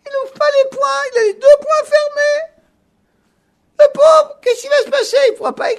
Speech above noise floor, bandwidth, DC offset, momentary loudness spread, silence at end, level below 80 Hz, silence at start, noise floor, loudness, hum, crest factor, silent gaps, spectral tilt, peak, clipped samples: 47 dB; 12.5 kHz; under 0.1%; 10 LU; 0 s; -60 dBFS; 0.05 s; -61 dBFS; -13 LUFS; none; 14 dB; none; -1 dB/octave; 0 dBFS; 0.2%